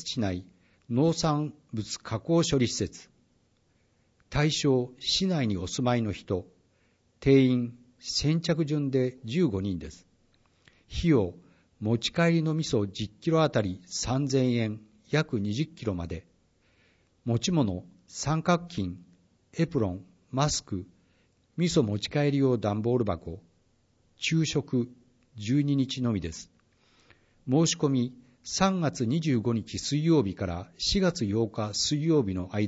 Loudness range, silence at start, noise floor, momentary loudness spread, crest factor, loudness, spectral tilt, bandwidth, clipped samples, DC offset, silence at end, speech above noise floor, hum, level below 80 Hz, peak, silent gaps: 4 LU; 0 s; -68 dBFS; 12 LU; 20 dB; -28 LUFS; -5.5 dB/octave; 8 kHz; under 0.1%; under 0.1%; 0 s; 41 dB; none; -52 dBFS; -10 dBFS; none